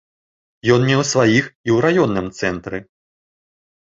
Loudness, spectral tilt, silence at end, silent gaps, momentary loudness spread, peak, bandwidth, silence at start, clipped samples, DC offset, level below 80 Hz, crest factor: -17 LUFS; -5.5 dB/octave; 1.05 s; 1.55-1.64 s; 11 LU; 0 dBFS; 7.8 kHz; 0.65 s; under 0.1%; under 0.1%; -50 dBFS; 18 dB